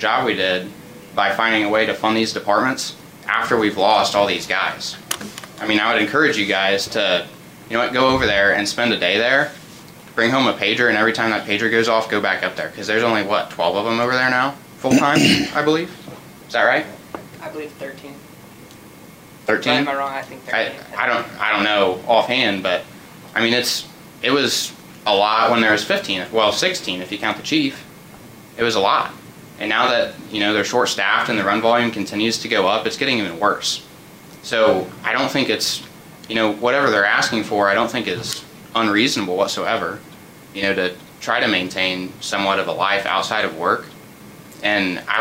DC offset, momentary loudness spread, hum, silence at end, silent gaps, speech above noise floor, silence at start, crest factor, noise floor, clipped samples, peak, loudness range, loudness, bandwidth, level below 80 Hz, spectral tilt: under 0.1%; 12 LU; none; 0 s; none; 23 dB; 0 s; 16 dB; -42 dBFS; under 0.1%; -4 dBFS; 4 LU; -18 LUFS; 16 kHz; -56 dBFS; -3.5 dB/octave